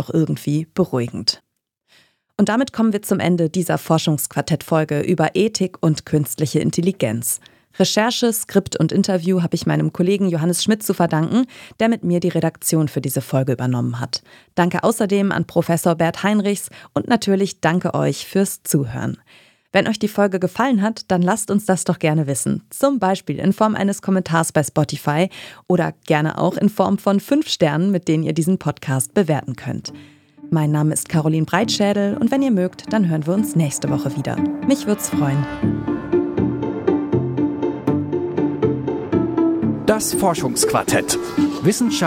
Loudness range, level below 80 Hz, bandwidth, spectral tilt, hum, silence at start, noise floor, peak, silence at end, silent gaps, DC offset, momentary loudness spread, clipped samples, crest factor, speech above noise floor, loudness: 2 LU; -52 dBFS; 17 kHz; -5.5 dB/octave; none; 0 s; -63 dBFS; -2 dBFS; 0 s; none; under 0.1%; 5 LU; under 0.1%; 18 dB; 44 dB; -19 LUFS